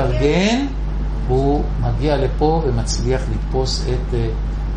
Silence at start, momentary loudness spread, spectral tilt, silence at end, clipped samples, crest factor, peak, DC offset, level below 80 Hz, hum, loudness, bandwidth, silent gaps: 0 s; 7 LU; -6 dB/octave; 0 s; under 0.1%; 14 dB; -4 dBFS; under 0.1%; -22 dBFS; none; -19 LUFS; 9.8 kHz; none